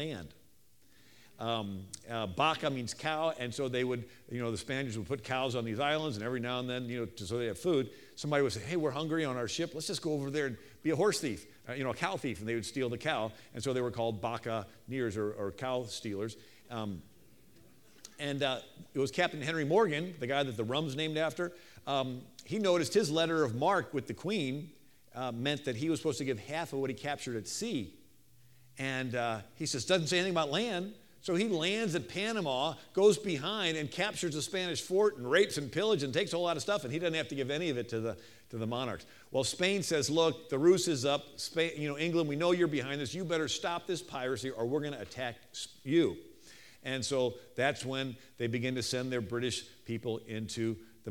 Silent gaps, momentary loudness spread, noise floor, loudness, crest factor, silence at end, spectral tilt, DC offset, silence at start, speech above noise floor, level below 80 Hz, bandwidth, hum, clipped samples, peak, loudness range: none; 11 LU; -67 dBFS; -34 LUFS; 22 dB; 0 s; -4.5 dB/octave; under 0.1%; 0 s; 34 dB; -68 dBFS; 18.5 kHz; none; under 0.1%; -12 dBFS; 5 LU